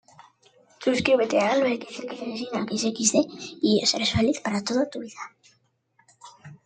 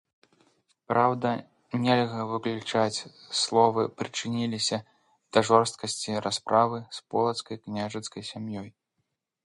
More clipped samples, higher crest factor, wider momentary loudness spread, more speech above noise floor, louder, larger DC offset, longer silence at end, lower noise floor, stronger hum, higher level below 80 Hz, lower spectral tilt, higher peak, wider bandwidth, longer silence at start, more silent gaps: neither; about the same, 20 dB vs 24 dB; about the same, 13 LU vs 13 LU; second, 42 dB vs 53 dB; first, -24 LUFS vs -27 LUFS; neither; second, 0.1 s vs 0.75 s; second, -67 dBFS vs -80 dBFS; neither; first, -58 dBFS vs -68 dBFS; about the same, -3.5 dB/octave vs -4.5 dB/octave; about the same, -6 dBFS vs -4 dBFS; second, 9.6 kHz vs 11.5 kHz; about the same, 0.8 s vs 0.9 s; neither